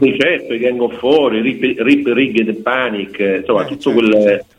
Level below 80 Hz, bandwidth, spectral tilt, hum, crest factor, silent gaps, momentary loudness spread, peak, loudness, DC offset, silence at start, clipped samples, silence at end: -54 dBFS; 10 kHz; -6.5 dB/octave; none; 14 dB; none; 5 LU; 0 dBFS; -14 LUFS; under 0.1%; 0 s; under 0.1%; 0.15 s